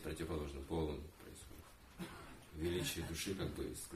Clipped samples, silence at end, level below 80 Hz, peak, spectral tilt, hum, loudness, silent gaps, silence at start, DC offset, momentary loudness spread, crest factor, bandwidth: under 0.1%; 0 s; -54 dBFS; -28 dBFS; -4.5 dB/octave; none; -44 LUFS; none; 0 s; under 0.1%; 15 LU; 18 dB; 15.5 kHz